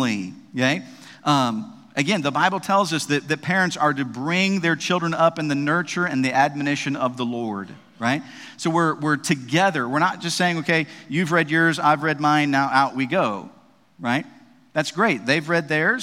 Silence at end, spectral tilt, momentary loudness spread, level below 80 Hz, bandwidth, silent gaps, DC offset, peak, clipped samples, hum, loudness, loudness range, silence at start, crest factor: 0 s; -4.5 dB/octave; 9 LU; -70 dBFS; 16 kHz; none; under 0.1%; -2 dBFS; under 0.1%; none; -21 LUFS; 3 LU; 0 s; 20 dB